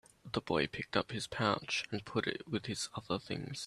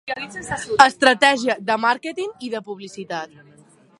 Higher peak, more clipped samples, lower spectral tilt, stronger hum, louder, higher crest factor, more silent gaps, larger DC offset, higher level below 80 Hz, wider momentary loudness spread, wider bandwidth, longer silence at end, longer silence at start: second, -16 dBFS vs 0 dBFS; neither; first, -4 dB/octave vs -2.5 dB/octave; neither; second, -37 LUFS vs -19 LUFS; about the same, 22 dB vs 20 dB; neither; neither; second, -66 dBFS vs -58 dBFS; second, 6 LU vs 17 LU; first, 13 kHz vs 11.5 kHz; second, 0 s vs 0.75 s; first, 0.25 s vs 0.05 s